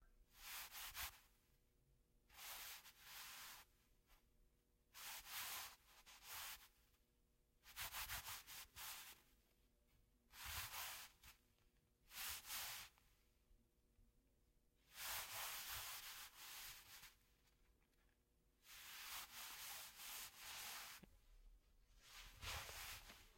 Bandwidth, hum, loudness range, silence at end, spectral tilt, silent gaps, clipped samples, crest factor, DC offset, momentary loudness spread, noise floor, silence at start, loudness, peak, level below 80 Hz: 16.5 kHz; none; 5 LU; 0 s; 0 dB/octave; none; under 0.1%; 22 dB; under 0.1%; 14 LU; -81 dBFS; 0 s; -53 LUFS; -36 dBFS; -72 dBFS